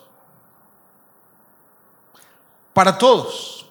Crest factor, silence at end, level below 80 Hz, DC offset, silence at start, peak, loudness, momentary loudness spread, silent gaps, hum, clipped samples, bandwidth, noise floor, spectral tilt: 22 dB; 0.1 s; -64 dBFS; under 0.1%; 2.75 s; 0 dBFS; -16 LUFS; 16 LU; none; none; under 0.1%; 19 kHz; -55 dBFS; -4 dB/octave